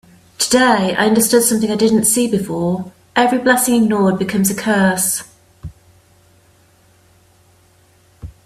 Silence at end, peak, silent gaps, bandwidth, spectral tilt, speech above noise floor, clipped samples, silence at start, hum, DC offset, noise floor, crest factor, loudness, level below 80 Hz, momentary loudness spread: 0.2 s; 0 dBFS; none; 16 kHz; -4 dB/octave; 38 dB; under 0.1%; 0.4 s; none; under 0.1%; -52 dBFS; 16 dB; -15 LUFS; -50 dBFS; 8 LU